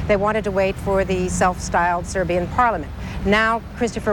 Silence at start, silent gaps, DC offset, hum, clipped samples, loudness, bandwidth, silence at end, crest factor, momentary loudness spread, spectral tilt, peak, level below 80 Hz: 0 s; none; under 0.1%; none; under 0.1%; -20 LUFS; 17 kHz; 0 s; 16 dB; 6 LU; -5 dB/octave; -4 dBFS; -34 dBFS